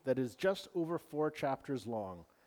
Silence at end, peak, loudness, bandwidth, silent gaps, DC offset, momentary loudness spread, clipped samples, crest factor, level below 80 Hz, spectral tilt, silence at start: 0.25 s; -22 dBFS; -38 LUFS; over 20 kHz; none; under 0.1%; 7 LU; under 0.1%; 16 dB; -74 dBFS; -6.5 dB/octave; 0.05 s